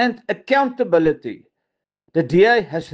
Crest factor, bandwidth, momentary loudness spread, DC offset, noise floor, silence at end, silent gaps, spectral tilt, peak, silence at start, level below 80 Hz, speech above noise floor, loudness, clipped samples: 16 dB; 8 kHz; 13 LU; under 0.1%; -80 dBFS; 0.05 s; none; -7 dB/octave; -4 dBFS; 0 s; -56 dBFS; 62 dB; -18 LUFS; under 0.1%